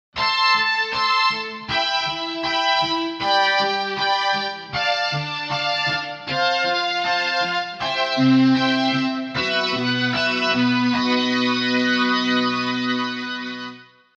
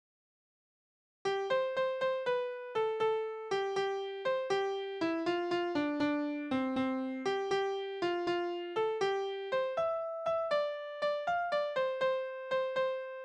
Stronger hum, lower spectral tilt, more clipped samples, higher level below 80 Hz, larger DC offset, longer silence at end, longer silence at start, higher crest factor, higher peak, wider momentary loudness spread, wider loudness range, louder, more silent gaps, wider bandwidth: neither; about the same, -4 dB/octave vs -4.5 dB/octave; neither; first, -58 dBFS vs -76 dBFS; neither; first, 0.35 s vs 0 s; second, 0.15 s vs 1.25 s; about the same, 16 dB vs 14 dB; first, -6 dBFS vs -20 dBFS; first, 7 LU vs 4 LU; about the same, 2 LU vs 1 LU; first, -20 LUFS vs -34 LUFS; neither; second, 8 kHz vs 9.8 kHz